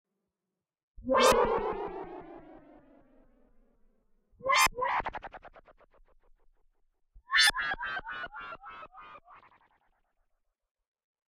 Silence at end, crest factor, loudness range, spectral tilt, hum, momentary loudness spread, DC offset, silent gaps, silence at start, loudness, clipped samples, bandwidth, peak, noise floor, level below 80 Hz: 2 s; 24 dB; 9 LU; -1.5 dB/octave; none; 24 LU; under 0.1%; none; 1 s; -28 LUFS; under 0.1%; 10 kHz; -10 dBFS; -89 dBFS; -54 dBFS